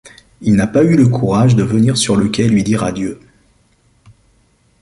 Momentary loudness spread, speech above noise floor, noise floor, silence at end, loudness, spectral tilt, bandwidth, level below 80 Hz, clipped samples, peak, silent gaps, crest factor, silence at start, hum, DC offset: 9 LU; 43 dB; -55 dBFS; 1.65 s; -13 LUFS; -6 dB/octave; 11.5 kHz; -42 dBFS; under 0.1%; -2 dBFS; none; 14 dB; 0.05 s; none; under 0.1%